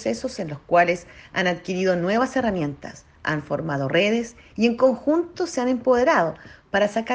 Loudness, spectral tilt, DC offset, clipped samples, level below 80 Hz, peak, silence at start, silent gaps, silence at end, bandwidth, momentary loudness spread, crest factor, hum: -22 LUFS; -5.5 dB/octave; under 0.1%; under 0.1%; -54 dBFS; -6 dBFS; 0 s; none; 0 s; 9.6 kHz; 11 LU; 18 dB; none